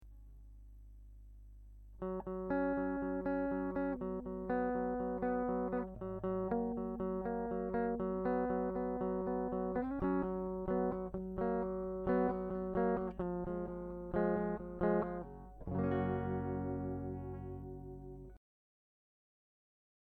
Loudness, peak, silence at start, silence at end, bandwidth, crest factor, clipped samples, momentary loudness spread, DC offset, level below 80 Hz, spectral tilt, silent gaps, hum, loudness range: -38 LUFS; -20 dBFS; 0 s; 1.7 s; 4.3 kHz; 18 dB; under 0.1%; 9 LU; under 0.1%; -54 dBFS; -11 dB/octave; none; 50 Hz at -55 dBFS; 4 LU